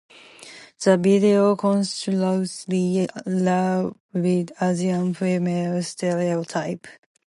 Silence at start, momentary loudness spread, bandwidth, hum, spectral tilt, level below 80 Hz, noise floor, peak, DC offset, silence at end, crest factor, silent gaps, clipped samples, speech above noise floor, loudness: 0.4 s; 10 LU; 11.5 kHz; none; -6.5 dB/octave; -68 dBFS; -45 dBFS; -4 dBFS; under 0.1%; 0.35 s; 18 dB; 4.00-4.09 s; under 0.1%; 23 dB; -22 LUFS